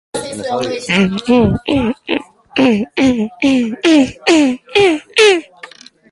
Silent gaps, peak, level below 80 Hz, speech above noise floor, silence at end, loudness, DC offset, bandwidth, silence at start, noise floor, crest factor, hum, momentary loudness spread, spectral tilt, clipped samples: none; 0 dBFS; -40 dBFS; 25 dB; 0.45 s; -14 LUFS; under 0.1%; 11.5 kHz; 0.15 s; -38 dBFS; 14 dB; none; 10 LU; -4.5 dB/octave; under 0.1%